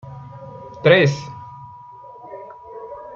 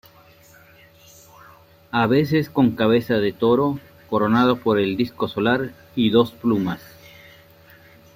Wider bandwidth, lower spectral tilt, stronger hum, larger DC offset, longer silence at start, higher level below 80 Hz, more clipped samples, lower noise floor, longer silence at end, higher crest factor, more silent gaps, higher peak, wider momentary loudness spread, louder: second, 7.2 kHz vs 16 kHz; second, -6 dB/octave vs -7.5 dB/octave; neither; neither; second, 0.05 s vs 1.95 s; about the same, -58 dBFS vs -56 dBFS; neither; second, -40 dBFS vs -50 dBFS; second, 0.05 s vs 1.35 s; about the same, 20 dB vs 18 dB; neither; about the same, -2 dBFS vs -4 dBFS; first, 26 LU vs 8 LU; first, -16 LUFS vs -20 LUFS